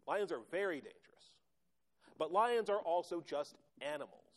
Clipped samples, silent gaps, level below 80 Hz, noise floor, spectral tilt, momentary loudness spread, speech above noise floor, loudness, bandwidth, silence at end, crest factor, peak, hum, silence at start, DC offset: under 0.1%; none; -88 dBFS; -87 dBFS; -4 dB/octave; 13 LU; 48 dB; -39 LUFS; 13 kHz; 0.3 s; 18 dB; -22 dBFS; none; 0.05 s; under 0.1%